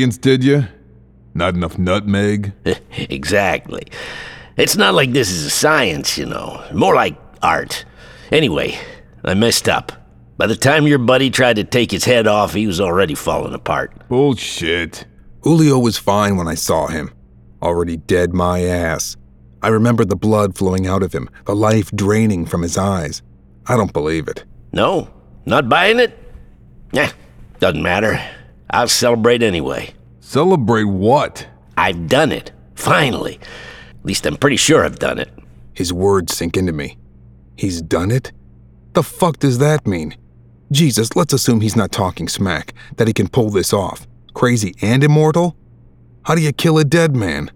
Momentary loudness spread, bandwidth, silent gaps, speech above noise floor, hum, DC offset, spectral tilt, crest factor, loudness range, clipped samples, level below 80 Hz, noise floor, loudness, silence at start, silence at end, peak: 14 LU; 18.5 kHz; none; 30 dB; none; under 0.1%; -5 dB/octave; 16 dB; 4 LU; under 0.1%; -40 dBFS; -45 dBFS; -16 LUFS; 0 s; 0.05 s; 0 dBFS